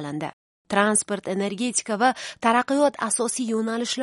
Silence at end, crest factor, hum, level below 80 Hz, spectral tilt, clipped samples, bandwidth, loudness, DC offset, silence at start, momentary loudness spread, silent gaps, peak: 0 s; 20 dB; none; -70 dBFS; -3 dB/octave; under 0.1%; 11.5 kHz; -23 LUFS; under 0.1%; 0 s; 7 LU; 0.33-0.65 s; -4 dBFS